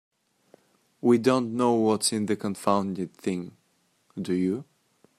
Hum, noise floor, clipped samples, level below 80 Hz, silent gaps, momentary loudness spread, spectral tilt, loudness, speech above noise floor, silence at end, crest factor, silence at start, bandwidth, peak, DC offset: none; -69 dBFS; under 0.1%; -72 dBFS; none; 13 LU; -5 dB/octave; -26 LUFS; 44 dB; 0.55 s; 20 dB; 1.05 s; 14.5 kHz; -8 dBFS; under 0.1%